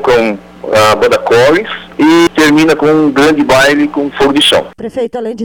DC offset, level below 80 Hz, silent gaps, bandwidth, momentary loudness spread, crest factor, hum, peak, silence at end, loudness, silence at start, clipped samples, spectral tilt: 0.3%; -38 dBFS; none; 19 kHz; 10 LU; 6 dB; none; -2 dBFS; 0 s; -9 LUFS; 0 s; under 0.1%; -4 dB/octave